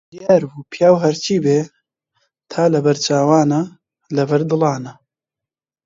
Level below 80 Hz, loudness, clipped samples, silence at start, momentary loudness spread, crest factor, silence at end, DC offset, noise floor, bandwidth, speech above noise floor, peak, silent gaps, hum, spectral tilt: -62 dBFS; -16 LUFS; under 0.1%; 0.15 s; 14 LU; 18 dB; 0.95 s; under 0.1%; -87 dBFS; 7.8 kHz; 72 dB; 0 dBFS; none; none; -6 dB/octave